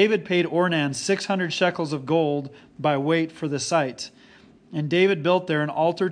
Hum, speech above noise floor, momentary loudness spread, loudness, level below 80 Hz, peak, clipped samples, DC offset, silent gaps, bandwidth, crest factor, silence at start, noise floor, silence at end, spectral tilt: none; 29 dB; 10 LU; -23 LUFS; -70 dBFS; -6 dBFS; under 0.1%; under 0.1%; none; 10.5 kHz; 16 dB; 0 s; -52 dBFS; 0 s; -5 dB/octave